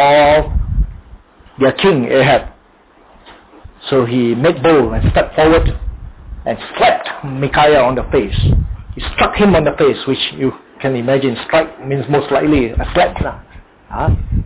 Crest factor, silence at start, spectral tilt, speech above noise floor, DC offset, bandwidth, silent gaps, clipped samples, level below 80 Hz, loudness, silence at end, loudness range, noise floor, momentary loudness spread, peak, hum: 12 dB; 0 s; -10.5 dB/octave; 34 dB; under 0.1%; 4 kHz; none; under 0.1%; -24 dBFS; -14 LUFS; 0 s; 2 LU; -47 dBFS; 12 LU; -2 dBFS; none